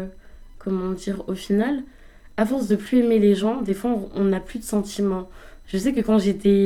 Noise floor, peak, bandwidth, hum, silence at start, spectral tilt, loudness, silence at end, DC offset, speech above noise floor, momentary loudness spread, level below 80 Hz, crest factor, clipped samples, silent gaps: -42 dBFS; -6 dBFS; 14.5 kHz; none; 0 s; -6.5 dB/octave; -23 LUFS; 0 s; under 0.1%; 21 dB; 11 LU; -44 dBFS; 16 dB; under 0.1%; none